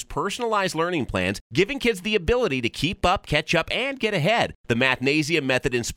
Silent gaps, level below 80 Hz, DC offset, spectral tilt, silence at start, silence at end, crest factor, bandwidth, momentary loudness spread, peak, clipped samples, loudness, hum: 1.41-1.50 s, 4.55-4.64 s; -42 dBFS; under 0.1%; -4.5 dB/octave; 0 s; 0.05 s; 18 dB; 16.5 kHz; 4 LU; -6 dBFS; under 0.1%; -23 LUFS; none